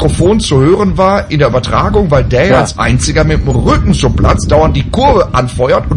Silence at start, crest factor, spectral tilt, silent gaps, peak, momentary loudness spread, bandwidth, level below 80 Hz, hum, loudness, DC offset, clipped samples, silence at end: 0 s; 8 dB; -6 dB/octave; none; 0 dBFS; 3 LU; 11 kHz; -18 dBFS; none; -10 LUFS; under 0.1%; 0.2%; 0 s